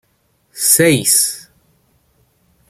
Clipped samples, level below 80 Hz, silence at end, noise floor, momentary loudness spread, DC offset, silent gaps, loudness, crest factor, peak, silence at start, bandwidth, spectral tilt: under 0.1%; -58 dBFS; 1.3 s; -61 dBFS; 8 LU; under 0.1%; none; -12 LUFS; 18 dB; 0 dBFS; 0.55 s; 16.5 kHz; -2.5 dB/octave